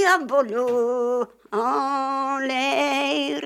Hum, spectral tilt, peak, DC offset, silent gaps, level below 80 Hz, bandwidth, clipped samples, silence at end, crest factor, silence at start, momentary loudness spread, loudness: none; -2.5 dB/octave; -6 dBFS; under 0.1%; none; -72 dBFS; 15 kHz; under 0.1%; 0 s; 16 dB; 0 s; 4 LU; -23 LUFS